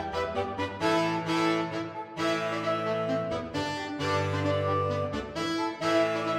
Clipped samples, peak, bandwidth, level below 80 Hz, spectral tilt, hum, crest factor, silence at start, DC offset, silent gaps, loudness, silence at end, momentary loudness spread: under 0.1%; -14 dBFS; 15 kHz; -58 dBFS; -5.5 dB/octave; none; 16 dB; 0 s; under 0.1%; none; -29 LUFS; 0 s; 6 LU